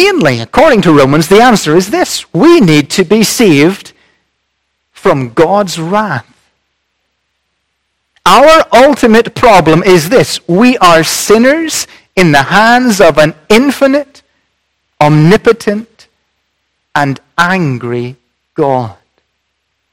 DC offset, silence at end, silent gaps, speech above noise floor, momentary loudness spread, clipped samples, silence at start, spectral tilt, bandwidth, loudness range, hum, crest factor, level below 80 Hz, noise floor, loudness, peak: under 0.1%; 1 s; none; 58 dB; 11 LU; 4%; 0 s; -5 dB/octave; 17.5 kHz; 8 LU; none; 8 dB; -38 dBFS; -65 dBFS; -7 LUFS; 0 dBFS